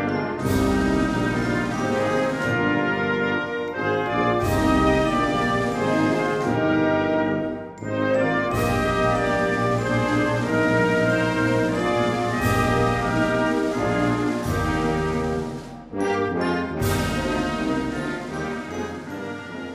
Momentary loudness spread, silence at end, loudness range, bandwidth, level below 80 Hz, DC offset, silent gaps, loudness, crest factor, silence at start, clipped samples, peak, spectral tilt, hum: 8 LU; 0 s; 4 LU; 15.5 kHz; -40 dBFS; under 0.1%; none; -22 LUFS; 14 dB; 0 s; under 0.1%; -8 dBFS; -6 dB/octave; none